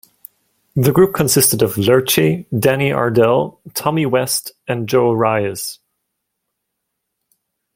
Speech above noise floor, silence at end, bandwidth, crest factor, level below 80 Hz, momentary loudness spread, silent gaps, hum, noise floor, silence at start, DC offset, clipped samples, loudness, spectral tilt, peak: 60 dB; 2 s; 16.5 kHz; 16 dB; -52 dBFS; 11 LU; none; none; -76 dBFS; 0.75 s; under 0.1%; under 0.1%; -15 LUFS; -4.5 dB/octave; 0 dBFS